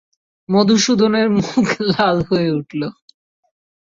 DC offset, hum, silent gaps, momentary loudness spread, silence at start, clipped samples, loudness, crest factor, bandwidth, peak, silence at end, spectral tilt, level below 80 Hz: under 0.1%; none; none; 10 LU; 0.5 s; under 0.1%; -16 LUFS; 16 dB; 7.6 kHz; -2 dBFS; 1.1 s; -5 dB/octave; -50 dBFS